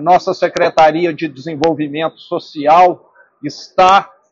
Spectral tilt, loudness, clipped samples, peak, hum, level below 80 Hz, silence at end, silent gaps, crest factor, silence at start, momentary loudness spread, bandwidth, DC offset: -3 dB/octave; -13 LUFS; under 0.1%; 0 dBFS; none; -50 dBFS; 0.25 s; none; 14 dB; 0 s; 15 LU; 7.8 kHz; under 0.1%